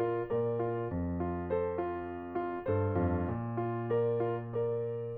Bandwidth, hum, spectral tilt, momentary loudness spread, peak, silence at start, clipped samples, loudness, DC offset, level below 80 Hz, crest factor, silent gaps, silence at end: 4 kHz; none; -12 dB/octave; 5 LU; -18 dBFS; 0 s; under 0.1%; -34 LUFS; under 0.1%; -54 dBFS; 14 dB; none; 0 s